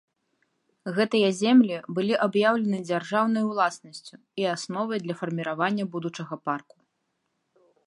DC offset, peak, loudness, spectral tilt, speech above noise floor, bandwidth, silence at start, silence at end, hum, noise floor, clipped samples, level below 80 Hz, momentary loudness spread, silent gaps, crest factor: under 0.1%; -8 dBFS; -25 LUFS; -5.5 dB/octave; 51 dB; 11.5 kHz; 0.85 s; 1.25 s; none; -77 dBFS; under 0.1%; -78 dBFS; 14 LU; none; 18 dB